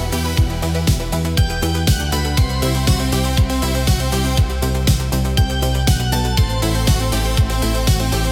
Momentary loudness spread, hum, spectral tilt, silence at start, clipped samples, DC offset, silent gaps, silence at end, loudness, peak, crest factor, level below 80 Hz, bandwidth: 2 LU; none; -5 dB/octave; 0 s; under 0.1%; under 0.1%; none; 0 s; -18 LUFS; -2 dBFS; 14 dB; -20 dBFS; 18 kHz